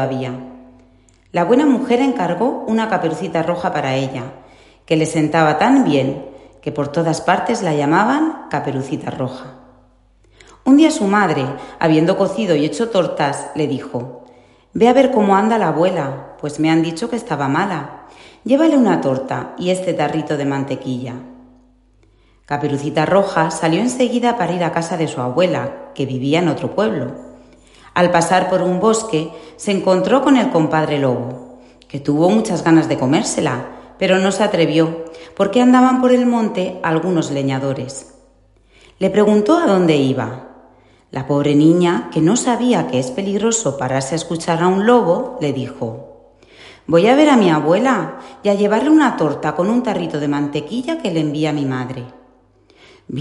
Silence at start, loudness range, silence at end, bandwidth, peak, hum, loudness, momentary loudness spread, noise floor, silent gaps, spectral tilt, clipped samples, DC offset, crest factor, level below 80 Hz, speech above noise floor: 0 s; 4 LU; 0 s; 11.5 kHz; 0 dBFS; none; -16 LUFS; 13 LU; -52 dBFS; none; -5.5 dB/octave; under 0.1%; under 0.1%; 16 dB; -54 dBFS; 37 dB